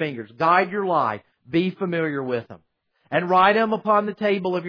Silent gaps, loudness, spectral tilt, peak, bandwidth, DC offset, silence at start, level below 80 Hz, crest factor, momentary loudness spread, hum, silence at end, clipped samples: none; -21 LUFS; -8 dB/octave; -4 dBFS; 5.4 kHz; under 0.1%; 0 s; -68 dBFS; 18 dB; 10 LU; none; 0 s; under 0.1%